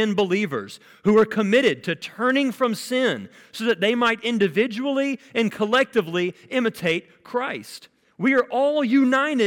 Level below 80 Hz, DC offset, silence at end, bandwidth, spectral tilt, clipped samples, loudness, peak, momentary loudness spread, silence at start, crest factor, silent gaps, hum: -68 dBFS; under 0.1%; 0 s; 17.5 kHz; -5 dB/octave; under 0.1%; -22 LUFS; -8 dBFS; 10 LU; 0 s; 12 dB; none; none